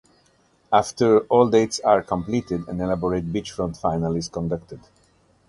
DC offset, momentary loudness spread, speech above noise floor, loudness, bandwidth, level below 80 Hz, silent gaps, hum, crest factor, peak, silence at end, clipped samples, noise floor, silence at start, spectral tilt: under 0.1%; 11 LU; 40 dB; -22 LUFS; 11.5 kHz; -48 dBFS; none; none; 20 dB; -2 dBFS; 0.7 s; under 0.1%; -61 dBFS; 0.7 s; -6 dB/octave